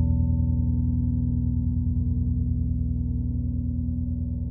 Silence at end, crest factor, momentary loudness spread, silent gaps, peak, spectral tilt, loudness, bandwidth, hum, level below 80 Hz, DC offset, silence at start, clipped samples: 0 s; 12 dB; 4 LU; none; -12 dBFS; -17 dB/octave; -26 LUFS; 1 kHz; 60 Hz at -30 dBFS; -28 dBFS; under 0.1%; 0 s; under 0.1%